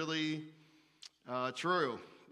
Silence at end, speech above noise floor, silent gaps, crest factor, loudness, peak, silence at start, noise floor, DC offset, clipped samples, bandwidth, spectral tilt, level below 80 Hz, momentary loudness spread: 0.1 s; 25 dB; none; 18 dB; -37 LUFS; -20 dBFS; 0 s; -62 dBFS; under 0.1%; under 0.1%; 11.5 kHz; -4.5 dB/octave; -88 dBFS; 21 LU